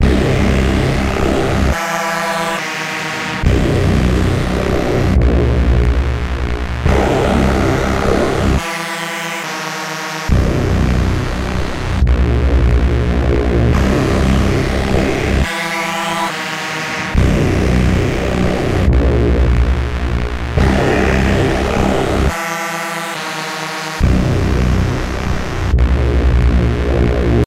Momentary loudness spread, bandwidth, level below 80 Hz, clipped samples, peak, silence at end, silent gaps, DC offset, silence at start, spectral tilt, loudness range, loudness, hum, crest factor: 6 LU; 15 kHz; -18 dBFS; under 0.1%; 0 dBFS; 0 s; none; under 0.1%; 0 s; -6 dB/octave; 2 LU; -15 LUFS; none; 14 dB